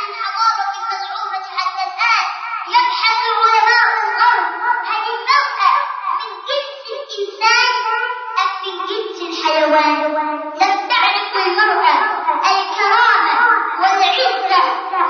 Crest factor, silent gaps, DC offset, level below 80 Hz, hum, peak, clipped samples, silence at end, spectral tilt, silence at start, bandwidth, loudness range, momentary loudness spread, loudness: 14 dB; none; under 0.1%; under -90 dBFS; none; -2 dBFS; under 0.1%; 0 s; 1 dB/octave; 0 s; 6.8 kHz; 4 LU; 10 LU; -15 LUFS